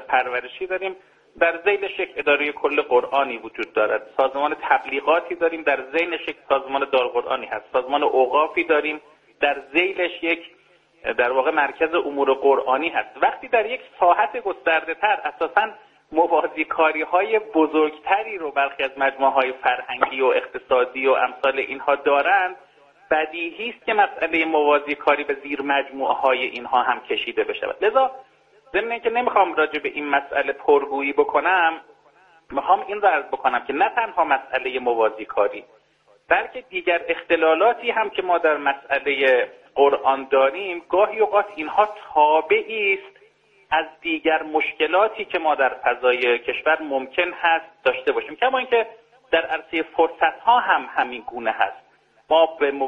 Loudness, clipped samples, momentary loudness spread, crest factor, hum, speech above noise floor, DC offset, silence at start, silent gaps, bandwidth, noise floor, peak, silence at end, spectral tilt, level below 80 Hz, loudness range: -21 LUFS; under 0.1%; 7 LU; 20 dB; none; 38 dB; under 0.1%; 0 s; none; 5.8 kHz; -59 dBFS; 0 dBFS; 0 s; -5 dB/octave; -62 dBFS; 2 LU